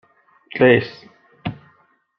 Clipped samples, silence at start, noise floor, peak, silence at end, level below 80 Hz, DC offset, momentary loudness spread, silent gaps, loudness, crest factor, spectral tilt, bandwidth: under 0.1%; 0.55 s; -59 dBFS; -2 dBFS; 0.65 s; -58 dBFS; under 0.1%; 19 LU; none; -16 LUFS; 20 dB; -8.5 dB/octave; 5.8 kHz